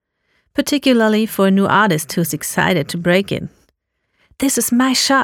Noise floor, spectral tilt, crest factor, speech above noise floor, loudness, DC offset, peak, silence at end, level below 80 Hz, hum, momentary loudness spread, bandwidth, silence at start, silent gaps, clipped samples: -69 dBFS; -4 dB/octave; 14 dB; 53 dB; -16 LUFS; under 0.1%; -2 dBFS; 0 s; -52 dBFS; none; 9 LU; 19.5 kHz; 0.55 s; none; under 0.1%